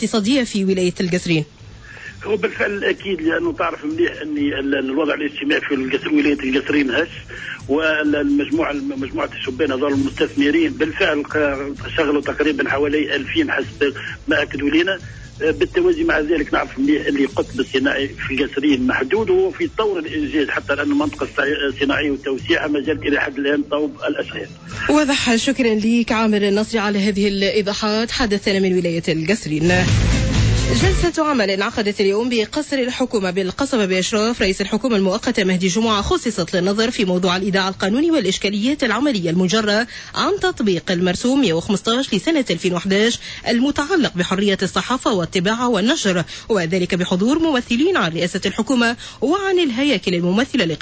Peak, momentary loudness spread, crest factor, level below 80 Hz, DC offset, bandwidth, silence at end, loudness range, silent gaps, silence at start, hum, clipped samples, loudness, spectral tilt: -6 dBFS; 5 LU; 14 dB; -36 dBFS; under 0.1%; 8 kHz; 0 s; 2 LU; none; 0 s; none; under 0.1%; -18 LUFS; -5 dB/octave